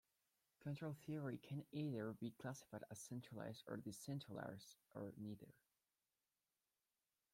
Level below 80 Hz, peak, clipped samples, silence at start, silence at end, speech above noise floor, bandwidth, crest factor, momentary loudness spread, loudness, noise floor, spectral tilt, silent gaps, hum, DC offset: -86 dBFS; -36 dBFS; under 0.1%; 0.6 s; 1.8 s; over 39 dB; 16.5 kHz; 16 dB; 8 LU; -52 LUFS; under -90 dBFS; -6 dB/octave; none; none; under 0.1%